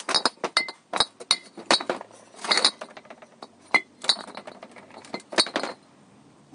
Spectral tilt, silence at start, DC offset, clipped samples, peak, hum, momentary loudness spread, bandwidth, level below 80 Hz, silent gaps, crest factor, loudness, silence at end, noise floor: -0.5 dB/octave; 0 s; under 0.1%; under 0.1%; -2 dBFS; none; 23 LU; 11.5 kHz; -68 dBFS; none; 26 dB; -24 LUFS; 0.8 s; -54 dBFS